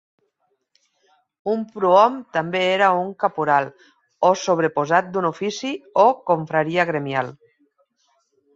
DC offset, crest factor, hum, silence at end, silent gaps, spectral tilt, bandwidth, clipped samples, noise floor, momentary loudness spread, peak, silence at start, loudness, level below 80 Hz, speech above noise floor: under 0.1%; 20 dB; none; 1.2 s; none; -5 dB/octave; 7.8 kHz; under 0.1%; -71 dBFS; 9 LU; -2 dBFS; 1.45 s; -20 LUFS; -70 dBFS; 51 dB